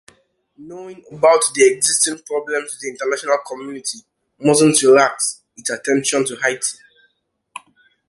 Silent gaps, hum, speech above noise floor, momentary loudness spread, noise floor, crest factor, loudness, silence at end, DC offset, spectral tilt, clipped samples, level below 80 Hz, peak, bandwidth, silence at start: none; none; 49 dB; 23 LU; -66 dBFS; 18 dB; -17 LUFS; 0.5 s; under 0.1%; -2.5 dB/octave; under 0.1%; -64 dBFS; -2 dBFS; 12 kHz; 0.6 s